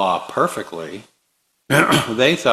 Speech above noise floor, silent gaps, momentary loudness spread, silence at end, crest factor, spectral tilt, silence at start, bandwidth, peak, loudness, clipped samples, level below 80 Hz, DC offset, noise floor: 50 dB; none; 17 LU; 0 s; 18 dB; -4 dB/octave; 0 s; 15 kHz; 0 dBFS; -17 LUFS; under 0.1%; -56 dBFS; under 0.1%; -68 dBFS